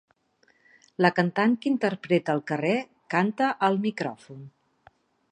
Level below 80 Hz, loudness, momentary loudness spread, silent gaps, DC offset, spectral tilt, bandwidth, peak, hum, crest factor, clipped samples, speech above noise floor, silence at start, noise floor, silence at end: -76 dBFS; -25 LUFS; 13 LU; none; under 0.1%; -7 dB/octave; 9.6 kHz; -4 dBFS; none; 22 dB; under 0.1%; 41 dB; 1 s; -66 dBFS; 0.85 s